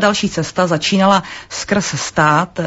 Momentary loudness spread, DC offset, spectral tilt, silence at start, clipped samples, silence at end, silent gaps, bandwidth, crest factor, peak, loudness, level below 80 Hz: 6 LU; under 0.1%; -4 dB/octave; 0 s; under 0.1%; 0 s; none; 8 kHz; 16 dB; 0 dBFS; -15 LUFS; -46 dBFS